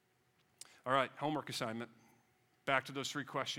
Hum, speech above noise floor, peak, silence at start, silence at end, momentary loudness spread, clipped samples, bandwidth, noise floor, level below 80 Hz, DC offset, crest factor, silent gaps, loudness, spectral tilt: none; 37 dB; -16 dBFS; 0.85 s; 0 s; 15 LU; under 0.1%; 17.5 kHz; -75 dBFS; -86 dBFS; under 0.1%; 24 dB; none; -38 LUFS; -3.5 dB/octave